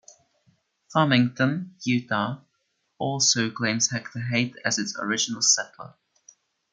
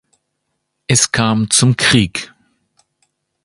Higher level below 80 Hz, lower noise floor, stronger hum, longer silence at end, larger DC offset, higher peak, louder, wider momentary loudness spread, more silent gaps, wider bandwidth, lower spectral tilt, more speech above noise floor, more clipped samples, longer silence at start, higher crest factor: second, -70 dBFS vs -44 dBFS; about the same, -74 dBFS vs -72 dBFS; neither; second, 0.85 s vs 1.2 s; neither; second, -6 dBFS vs 0 dBFS; second, -24 LUFS vs -13 LUFS; second, 11 LU vs 17 LU; neither; about the same, 10.5 kHz vs 11.5 kHz; about the same, -3 dB/octave vs -3.5 dB/octave; second, 49 dB vs 58 dB; neither; about the same, 0.9 s vs 0.9 s; about the same, 20 dB vs 18 dB